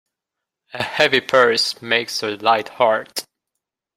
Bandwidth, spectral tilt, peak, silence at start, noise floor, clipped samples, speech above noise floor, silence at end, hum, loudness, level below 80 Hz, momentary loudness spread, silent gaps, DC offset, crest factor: 16 kHz; -2.5 dB/octave; -2 dBFS; 0.75 s; -83 dBFS; under 0.1%; 65 dB; 0.75 s; none; -18 LUFS; -64 dBFS; 13 LU; none; under 0.1%; 20 dB